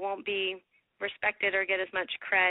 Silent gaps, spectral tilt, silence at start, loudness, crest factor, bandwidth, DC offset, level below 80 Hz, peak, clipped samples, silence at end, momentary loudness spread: none; 1 dB/octave; 0 s; -30 LUFS; 18 dB; 4 kHz; under 0.1%; -70 dBFS; -12 dBFS; under 0.1%; 0 s; 10 LU